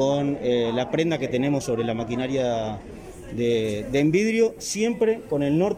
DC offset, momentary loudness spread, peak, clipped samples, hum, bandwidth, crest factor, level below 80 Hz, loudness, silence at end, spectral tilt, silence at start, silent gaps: under 0.1%; 7 LU; -10 dBFS; under 0.1%; none; 15.5 kHz; 14 dB; -50 dBFS; -24 LUFS; 0 s; -5.5 dB/octave; 0 s; none